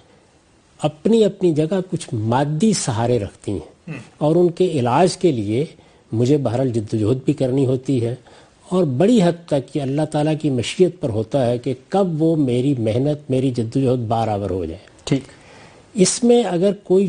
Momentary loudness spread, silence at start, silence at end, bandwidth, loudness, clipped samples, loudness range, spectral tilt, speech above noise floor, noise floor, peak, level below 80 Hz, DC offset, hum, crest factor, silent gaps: 10 LU; 0.8 s; 0 s; 11.5 kHz; -19 LUFS; under 0.1%; 2 LU; -6.5 dB/octave; 36 dB; -54 dBFS; -2 dBFS; -52 dBFS; under 0.1%; none; 16 dB; none